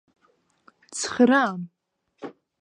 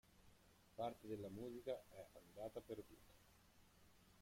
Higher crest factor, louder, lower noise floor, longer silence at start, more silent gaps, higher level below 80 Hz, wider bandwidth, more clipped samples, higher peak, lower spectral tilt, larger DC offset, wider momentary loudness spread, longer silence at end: about the same, 20 dB vs 20 dB; first, -22 LUFS vs -53 LUFS; second, -66 dBFS vs -71 dBFS; first, 0.9 s vs 0.05 s; neither; first, -70 dBFS vs -76 dBFS; second, 10.5 kHz vs 16.5 kHz; neither; first, -6 dBFS vs -34 dBFS; second, -4 dB/octave vs -6 dB/octave; neither; first, 23 LU vs 12 LU; first, 0.3 s vs 0 s